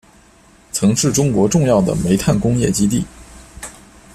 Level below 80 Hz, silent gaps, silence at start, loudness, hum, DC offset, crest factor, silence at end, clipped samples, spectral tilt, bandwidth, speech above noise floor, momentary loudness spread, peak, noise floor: -38 dBFS; none; 0.75 s; -16 LUFS; none; under 0.1%; 14 dB; 0.45 s; under 0.1%; -5.5 dB/octave; 14.5 kHz; 33 dB; 19 LU; -2 dBFS; -48 dBFS